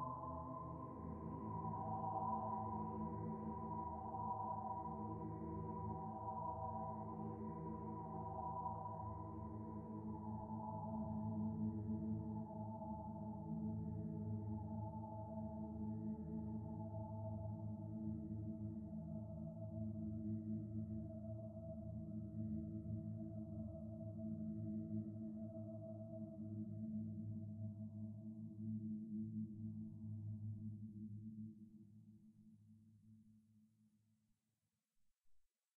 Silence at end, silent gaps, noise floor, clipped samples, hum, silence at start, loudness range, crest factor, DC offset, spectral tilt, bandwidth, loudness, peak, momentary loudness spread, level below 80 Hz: 0.35 s; none; under -90 dBFS; under 0.1%; none; 0 s; 4 LU; 16 dB; under 0.1%; -10.5 dB/octave; 2.3 kHz; -48 LUFS; -32 dBFS; 7 LU; -64 dBFS